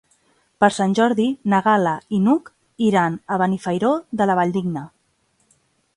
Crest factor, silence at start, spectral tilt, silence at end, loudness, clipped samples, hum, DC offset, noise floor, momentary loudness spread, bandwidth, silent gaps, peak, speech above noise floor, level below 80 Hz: 20 dB; 0.6 s; -6.5 dB/octave; 1.1 s; -19 LUFS; under 0.1%; none; under 0.1%; -65 dBFS; 5 LU; 11.5 kHz; none; 0 dBFS; 46 dB; -62 dBFS